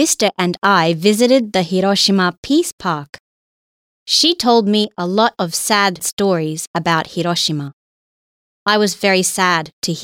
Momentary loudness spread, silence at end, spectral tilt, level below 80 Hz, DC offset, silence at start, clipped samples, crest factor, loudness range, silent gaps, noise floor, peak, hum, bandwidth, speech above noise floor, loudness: 8 LU; 0 s; -3.5 dB/octave; -58 dBFS; under 0.1%; 0 s; under 0.1%; 14 dB; 3 LU; 2.37-2.43 s, 2.72-2.78 s, 3.09-3.13 s, 3.20-4.06 s, 6.13-6.17 s, 6.67-6.74 s, 7.73-8.66 s, 9.73-9.82 s; under -90 dBFS; -2 dBFS; none; 17 kHz; over 74 dB; -15 LUFS